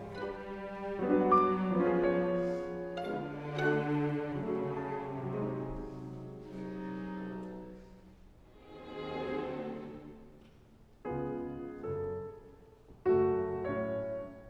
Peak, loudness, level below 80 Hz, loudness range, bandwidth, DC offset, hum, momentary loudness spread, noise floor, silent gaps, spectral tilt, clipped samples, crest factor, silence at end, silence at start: -14 dBFS; -35 LUFS; -58 dBFS; 12 LU; 7.6 kHz; under 0.1%; none; 17 LU; -59 dBFS; none; -8.5 dB/octave; under 0.1%; 22 dB; 0 s; 0 s